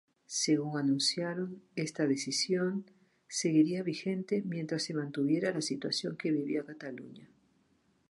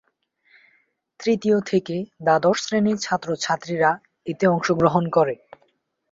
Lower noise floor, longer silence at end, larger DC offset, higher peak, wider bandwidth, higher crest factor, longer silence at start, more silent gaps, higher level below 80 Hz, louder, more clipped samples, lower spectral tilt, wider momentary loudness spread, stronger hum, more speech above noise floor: first, -71 dBFS vs -66 dBFS; about the same, 0.85 s vs 0.75 s; neither; second, -16 dBFS vs -2 dBFS; first, 11.5 kHz vs 7.8 kHz; about the same, 18 dB vs 20 dB; second, 0.3 s vs 1.2 s; neither; second, -80 dBFS vs -60 dBFS; second, -32 LUFS vs -21 LUFS; neither; about the same, -4.5 dB/octave vs -5.5 dB/octave; about the same, 10 LU vs 8 LU; neither; second, 39 dB vs 46 dB